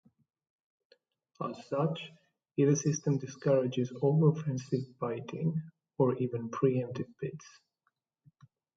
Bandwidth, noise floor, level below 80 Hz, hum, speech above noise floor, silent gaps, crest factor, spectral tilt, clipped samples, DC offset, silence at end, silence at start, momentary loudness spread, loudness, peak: 7.6 kHz; -81 dBFS; -74 dBFS; none; 50 dB; none; 20 dB; -7 dB/octave; under 0.1%; under 0.1%; 1.3 s; 1.4 s; 13 LU; -32 LUFS; -14 dBFS